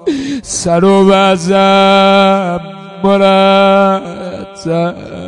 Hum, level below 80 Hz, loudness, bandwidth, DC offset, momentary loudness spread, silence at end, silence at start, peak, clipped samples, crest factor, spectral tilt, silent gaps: none; -46 dBFS; -10 LUFS; 11 kHz; under 0.1%; 15 LU; 0 s; 0 s; 0 dBFS; under 0.1%; 10 dB; -5 dB/octave; none